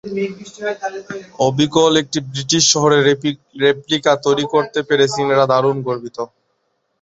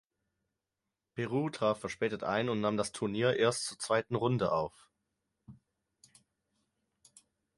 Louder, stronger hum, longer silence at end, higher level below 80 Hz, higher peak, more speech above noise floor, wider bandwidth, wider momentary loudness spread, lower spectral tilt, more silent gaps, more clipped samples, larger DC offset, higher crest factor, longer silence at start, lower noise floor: first, -16 LUFS vs -33 LUFS; neither; second, 0.75 s vs 2.05 s; first, -58 dBFS vs -68 dBFS; first, 0 dBFS vs -14 dBFS; second, 51 dB vs 57 dB; second, 8.2 kHz vs 11.5 kHz; first, 14 LU vs 6 LU; second, -3.5 dB/octave vs -5 dB/octave; neither; neither; neither; about the same, 16 dB vs 20 dB; second, 0.05 s vs 1.15 s; second, -68 dBFS vs -89 dBFS